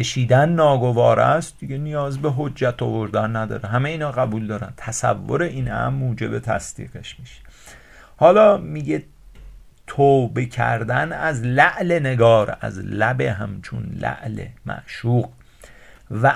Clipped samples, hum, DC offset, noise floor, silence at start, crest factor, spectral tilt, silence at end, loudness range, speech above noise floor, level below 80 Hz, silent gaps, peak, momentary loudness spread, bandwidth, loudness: under 0.1%; none; under 0.1%; -45 dBFS; 0 s; 20 dB; -6 dB/octave; 0 s; 7 LU; 26 dB; -46 dBFS; none; 0 dBFS; 15 LU; 11.5 kHz; -20 LUFS